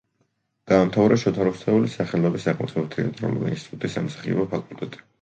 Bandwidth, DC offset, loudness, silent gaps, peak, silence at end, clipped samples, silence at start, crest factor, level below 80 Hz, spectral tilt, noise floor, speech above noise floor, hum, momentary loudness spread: 9 kHz; under 0.1%; -23 LUFS; none; -4 dBFS; 0.25 s; under 0.1%; 0.65 s; 20 dB; -56 dBFS; -7.5 dB/octave; -71 dBFS; 48 dB; none; 11 LU